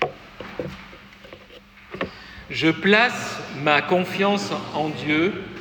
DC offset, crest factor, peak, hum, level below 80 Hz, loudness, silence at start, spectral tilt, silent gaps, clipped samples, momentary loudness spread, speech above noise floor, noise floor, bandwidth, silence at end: under 0.1%; 22 dB; -2 dBFS; none; -54 dBFS; -22 LUFS; 0 s; -5 dB/octave; none; under 0.1%; 23 LU; 25 dB; -46 dBFS; 20 kHz; 0 s